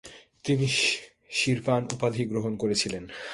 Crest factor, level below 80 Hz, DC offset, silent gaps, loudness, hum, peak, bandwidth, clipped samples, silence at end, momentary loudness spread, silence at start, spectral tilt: 20 dB; -60 dBFS; under 0.1%; none; -27 LUFS; none; -8 dBFS; 11.5 kHz; under 0.1%; 0 s; 8 LU; 0.05 s; -4 dB/octave